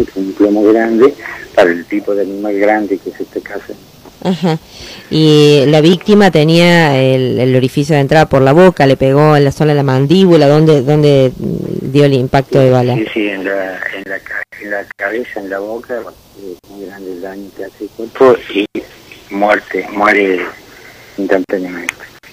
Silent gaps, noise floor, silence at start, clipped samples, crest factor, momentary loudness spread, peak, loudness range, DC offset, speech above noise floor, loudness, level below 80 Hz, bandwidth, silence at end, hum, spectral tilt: none; -37 dBFS; 0 s; under 0.1%; 12 dB; 19 LU; 0 dBFS; 11 LU; under 0.1%; 26 dB; -11 LUFS; -44 dBFS; 16 kHz; 0.25 s; none; -6.5 dB/octave